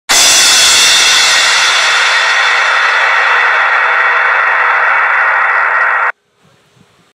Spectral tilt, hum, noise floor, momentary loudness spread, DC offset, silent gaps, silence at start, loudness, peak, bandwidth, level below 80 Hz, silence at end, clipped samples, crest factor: 2.5 dB/octave; none; -51 dBFS; 5 LU; under 0.1%; none; 0.1 s; -7 LUFS; 0 dBFS; 16.5 kHz; -50 dBFS; 1.05 s; under 0.1%; 10 dB